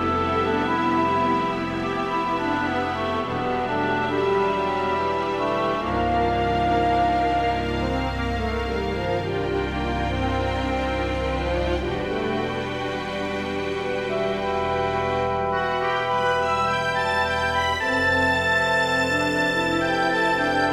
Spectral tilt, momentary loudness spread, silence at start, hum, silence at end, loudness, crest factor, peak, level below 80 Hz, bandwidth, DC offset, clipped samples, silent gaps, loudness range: -5.5 dB/octave; 5 LU; 0 s; none; 0 s; -23 LUFS; 14 dB; -8 dBFS; -38 dBFS; 15.5 kHz; under 0.1%; under 0.1%; none; 5 LU